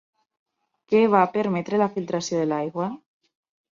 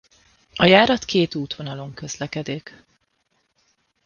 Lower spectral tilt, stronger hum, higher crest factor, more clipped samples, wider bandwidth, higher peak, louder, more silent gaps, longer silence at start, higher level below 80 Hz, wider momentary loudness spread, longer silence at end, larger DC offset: about the same, -6 dB/octave vs -5 dB/octave; neither; about the same, 20 dB vs 22 dB; neither; about the same, 7.4 kHz vs 7.2 kHz; second, -4 dBFS vs 0 dBFS; second, -23 LUFS vs -20 LUFS; neither; first, 0.9 s vs 0.55 s; second, -70 dBFS vs -54 dBFS; second, 11 LU vs 19 LU; second, 0.8 s vs 1.45 s; neither